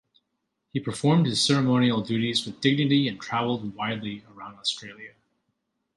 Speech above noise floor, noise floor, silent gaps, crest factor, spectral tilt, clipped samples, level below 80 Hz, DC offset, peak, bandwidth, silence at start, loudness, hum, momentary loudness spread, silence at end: 54 dB; -79 dBFS; none; 18 dB; -5 dB/octave; under 0.1%; -64 dBFS; under 0.1%; -8 dBFS; 11.5 kHz; 0.75 s; -25 LUFS; none; 15 LU; 0.9 s